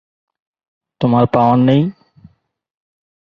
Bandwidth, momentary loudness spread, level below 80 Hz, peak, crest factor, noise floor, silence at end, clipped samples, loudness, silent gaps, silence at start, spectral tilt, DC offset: 5.4 kHz; 8 LU; -52 dBFS; 0 dBFS; 16 dB; -48 dBFS; 1.4 s; under 0.1%; -14 LUFS; none; 1 s; -10 dB/octave; under 0.1%